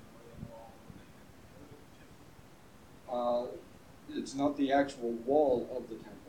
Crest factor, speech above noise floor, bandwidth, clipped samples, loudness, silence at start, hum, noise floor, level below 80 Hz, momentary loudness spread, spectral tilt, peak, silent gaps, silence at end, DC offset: 20 dB; 25 dB; 16.5 kHz; under 0.1%; -33 LUFS; 0 s; none; -57 dBFS; -64 dBFS; 26 LU; -5.5 dB/octave; -16 dBFS; none; 0 s; under 0.1%